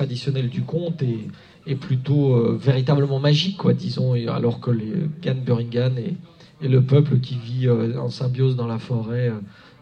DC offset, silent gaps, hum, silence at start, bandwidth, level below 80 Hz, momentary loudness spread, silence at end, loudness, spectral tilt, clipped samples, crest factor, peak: under 0.1%; none; none; 0 s; 6.8 kHz; -58 dBFS; 11 LU; 0.3 s; -22 LUFS; -8 dB/octave; under 0.1%; 18 dB; -4 dBFS